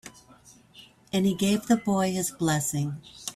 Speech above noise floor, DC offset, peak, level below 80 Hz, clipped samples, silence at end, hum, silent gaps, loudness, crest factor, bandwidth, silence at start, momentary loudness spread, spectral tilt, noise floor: 29 dB; under 0.1%; -12 dBFS; -62 dBFS; under 0.1%; 0.05 s; none; none; -26 LUFS; 16 dB; 15.5 kHz; 0.05 s; 10 LU; -5 dB/octave; -55 dBFS